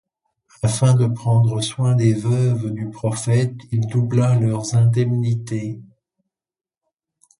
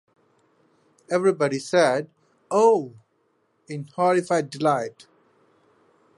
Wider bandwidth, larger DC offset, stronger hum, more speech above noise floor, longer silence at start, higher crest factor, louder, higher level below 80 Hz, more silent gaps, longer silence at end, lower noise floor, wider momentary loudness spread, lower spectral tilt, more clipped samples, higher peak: about the same, 11.5 kHz vs 11.5 kHz; neither; neither; first, over 72 dB vs 47 dB; second, 0.65 s vs 1.1 s; about the same, 16 dB vs 18 dB; first, -19 LUFS vs -22 LUFS; first, -52 dBFS vs -78 dBFS; neither; first, 1.55 s vs 1.25 s; first, under -90 dBFS vs -68 dBFS; second, 8 LU vs 17 LU; about the same, -6.5 dB/octave vs -5.5 dB/octave; neither; about the same, -4 dBFS vs -6 dBFS